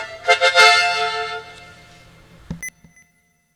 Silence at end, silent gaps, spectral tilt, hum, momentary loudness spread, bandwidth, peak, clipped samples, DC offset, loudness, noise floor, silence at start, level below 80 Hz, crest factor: 0.85 s; none; -0.5 dB/octave; none; 22 LU; 19.5 kHz; 0 dBFS; under 0.1%; under 0.1%; -14 LUFS; -62 dBFS; 0 s; -52 dBFS; 20 dB